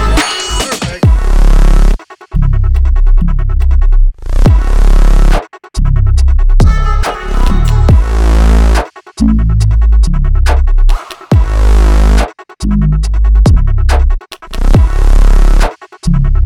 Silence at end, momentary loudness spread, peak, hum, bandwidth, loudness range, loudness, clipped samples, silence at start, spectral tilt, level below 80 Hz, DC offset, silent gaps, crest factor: 0 s; 7 LU; 0 dBFS; none; 11 kHz; 2 LU; -12 LUFS; 0.6%; 0 s; -6 dB/octave; -8 dBFS; under 0.1%; none; 8 dB